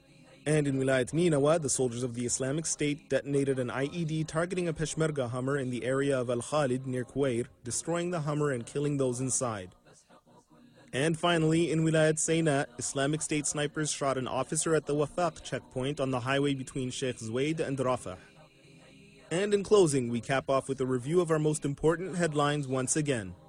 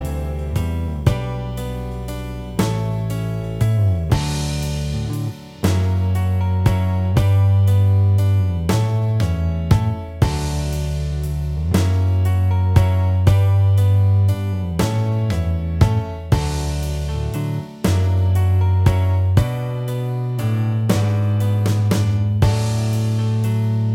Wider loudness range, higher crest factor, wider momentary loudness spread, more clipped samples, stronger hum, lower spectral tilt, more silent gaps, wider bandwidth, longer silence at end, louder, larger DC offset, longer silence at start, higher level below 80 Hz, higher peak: about the same, 4 LU vs 4 LU; about the same, 18 dB vs 16 dB; about the same, 7 LU vs 9 LU; neither; neither; second, -5 dB/octave vs -7 dB/octave; neither; second, 13 kHz vs 15.5 kHz; first, 0.15 s vs 0 s; second, -30 LUFS vs -19 LUFS; neither; first, 0.45 s vs 0 s; second, -58 dBFS vs -30 dBFS; second, -12 dBFS vs 0 dBFS